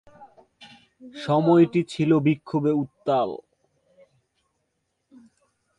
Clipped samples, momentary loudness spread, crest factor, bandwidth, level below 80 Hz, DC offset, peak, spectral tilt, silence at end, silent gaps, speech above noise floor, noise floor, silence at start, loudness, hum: under 0.1%; 15 LU; 18 dB; 9.6 kHz; -66 dBFS; under 0.1%; -6 dBFS; -8 dB/octave; 2.4 s; none; 54 dB; -76 dBFS; 0.2 s; -22 LUFS; none